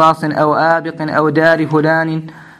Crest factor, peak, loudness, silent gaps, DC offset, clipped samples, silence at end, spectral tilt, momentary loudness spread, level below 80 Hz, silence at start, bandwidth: 14 dB; 0 dBFS; -13 LUFS; none; under 0.1%; under 0.1%; 0.15 s; -7 dB/octave; 6 LU; -56 dBFS; 0 s; 12.5 kHz